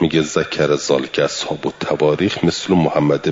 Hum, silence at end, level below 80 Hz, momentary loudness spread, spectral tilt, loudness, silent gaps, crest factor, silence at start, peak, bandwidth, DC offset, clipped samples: none; 0 s; -52 dBFS; 6 LU; -5 dB/octave; -17 LUFS; none; 14 dB; 0 s; -2 dBFS; 7.8 kHz; under 0.1%; under 0.1%